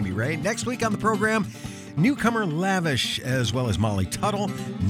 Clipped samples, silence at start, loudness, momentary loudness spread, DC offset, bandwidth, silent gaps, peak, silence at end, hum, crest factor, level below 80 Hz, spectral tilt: under 0.1%; 0 s; -24 LUFS; 5 LU; under 0.1%; 16.5 kHz; none; -6 dBFS; 0 s; none; 18 dB; -48 dBFS; -5 dB/octave